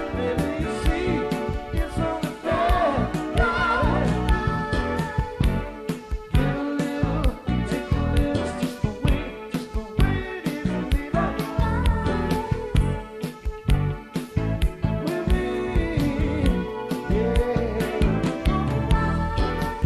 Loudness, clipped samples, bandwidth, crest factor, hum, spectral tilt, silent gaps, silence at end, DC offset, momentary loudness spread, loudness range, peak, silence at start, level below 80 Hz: -25 LUFS; under 0.1%; 14 kHz; 16 dB; none; -7 dB/octave; none; 0 s; under 0.1%; 6 LU; 3 LU; -6 dBFS; 0 s; -28 dBFS